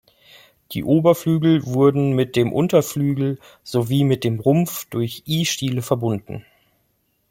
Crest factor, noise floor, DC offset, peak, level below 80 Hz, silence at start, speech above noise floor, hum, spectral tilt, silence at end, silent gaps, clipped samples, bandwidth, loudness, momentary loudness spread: 18 dB; -67 dBFS; under 0.1%; -2 dBFS; -56 dBFS; 0.7 s; 48 dB; none; -6.5 dB/octave; 0.9 s; none; under 0.1%; 17 kHz; -20 LUFS; 9 LU